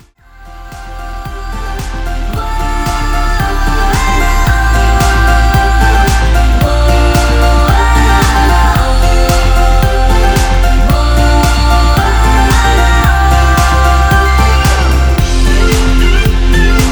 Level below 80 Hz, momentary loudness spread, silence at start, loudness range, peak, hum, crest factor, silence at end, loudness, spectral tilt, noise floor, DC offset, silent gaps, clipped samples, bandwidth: -10 dBFS; 10 LU; 0.4 s; 6 LU; 0 dBFS; none; 8 dB; 0 s; -10 LUFS; -5 dB/octave; -35 dBFS; under 0.1%; none; under 0.1%; over 20 kHz